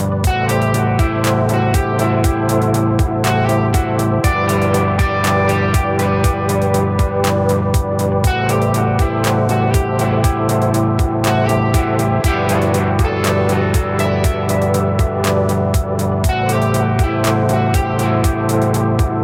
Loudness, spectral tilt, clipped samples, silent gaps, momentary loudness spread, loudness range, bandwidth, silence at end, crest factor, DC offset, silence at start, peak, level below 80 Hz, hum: -16 LUFS; -6 dB/octave; under 0.1%; none; 2 LU; 1 LU; 16.5 kHz; 0 s; 14 dB; under 0.1%; 0 s; -2 dBFS; -24 dBFS; none